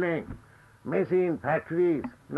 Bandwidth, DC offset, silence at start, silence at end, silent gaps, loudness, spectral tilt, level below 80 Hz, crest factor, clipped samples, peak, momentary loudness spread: 4.9 kHz; under 0.1%; 0 s; 0 s; none; -28 LUFS; -9 dB/octave; -58 dBFS; 14 dB; under 0.1%; -14 dBFS; 18 LU